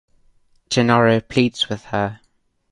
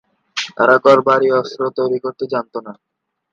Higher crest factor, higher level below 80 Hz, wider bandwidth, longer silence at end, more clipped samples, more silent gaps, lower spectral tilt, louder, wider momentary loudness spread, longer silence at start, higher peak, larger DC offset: about the same, 18 dB vs 16 dB; first, -52 dBFS vs -66 dBFS; first, 11 kHz vs 7.6 kHz; about the same, 0.55 s vs 0.6 s; neither; neither; about the same, -5.5 dB/octave vs -5 dB/octave; second, -19 LUFS vs -15 LUFS; second, 9 LU vs 15 LU; first, 0.7 s vs 0.35 s; about the same, -2 dBFS vs 0 dBFS; neither